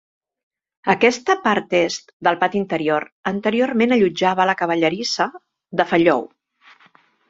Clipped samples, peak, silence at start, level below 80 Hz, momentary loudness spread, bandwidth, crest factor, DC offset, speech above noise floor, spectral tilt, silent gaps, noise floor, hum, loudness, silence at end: under 0.1%; -2 dBFS; 0.85 s; -62 dBFS; 7 LU; 7.8 kHz; 18 dB; under 0.1%; 36 dB; -4.5 dB/octave; 2.13-2.20 s, 3.12-3.23 s; -55 dBFS; none; -19 LUFS; 1.05 s